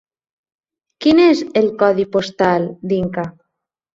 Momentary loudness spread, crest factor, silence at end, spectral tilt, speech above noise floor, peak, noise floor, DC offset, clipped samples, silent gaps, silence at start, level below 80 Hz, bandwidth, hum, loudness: 10 LU; 16 dB; 0.65 s; -6.5 dB/octave; 62 dB; -2 dBFS; -77 dBFS; under 0.1%; under 0.1%; none; 1 s; -54 dBFS; 7.8 kHz; none; -16 LUFS